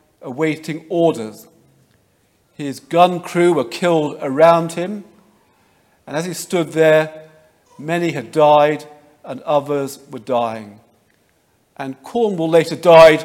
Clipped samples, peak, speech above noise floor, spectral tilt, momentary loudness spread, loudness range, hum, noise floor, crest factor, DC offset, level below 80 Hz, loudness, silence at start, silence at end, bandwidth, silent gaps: under 0.1%; 0 dBFS; 44 dB; -5.5 dB/octave; 18 LU; 5 LU; none; -60 dBFS; 18 dB; under 0.1%; -58 dBFS; -16 LUFS; 0.25 s; 0 s; 16 kHz; none